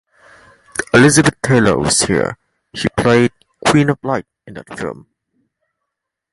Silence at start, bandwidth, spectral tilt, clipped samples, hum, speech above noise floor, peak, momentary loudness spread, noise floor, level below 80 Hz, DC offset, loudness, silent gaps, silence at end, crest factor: 0.8 s; 11.5 kHz; -4.5 dB/octave; under 0.1%; none; 65 dB; 0 dBFS; 21 LU; -78 dBFS; -42 dBFS; under 0.1%; -14 LUFS; none; 1.4 s; 16 dB